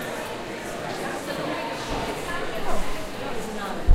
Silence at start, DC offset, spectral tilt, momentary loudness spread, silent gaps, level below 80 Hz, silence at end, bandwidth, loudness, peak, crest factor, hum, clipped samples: 0 s; under 0.1%; -4.5 dB/octave; 3 LU; none; -38 dBFS; 0 s; 16 kHz; -30 LUFS; -4 dBFS; 20 dB; none; under 0.1%